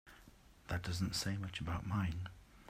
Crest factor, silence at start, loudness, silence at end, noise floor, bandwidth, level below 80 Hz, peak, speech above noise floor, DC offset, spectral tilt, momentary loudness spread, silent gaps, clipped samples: 16 dB; 0.05 s; -41 LUFS; 0 s; -62 dBFS; 15.5 kHz; -56 dBFS; -24 dBFS; 23 dB; under 0.1%; -4.5 dB/octave; 13 LU; none; under 0.1%